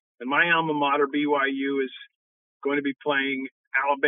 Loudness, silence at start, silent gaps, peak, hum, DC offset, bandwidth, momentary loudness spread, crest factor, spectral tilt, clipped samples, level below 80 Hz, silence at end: -24 LUFS; 0.2 s; 2.15-2.60 s, 3.52-3.71 s; -8 dBFS; none; under 0.1%; 3.8 kHz; 10 LU; 18 dB; -8 dB/octave; under 0.1%; under -90 dBFS; 0 s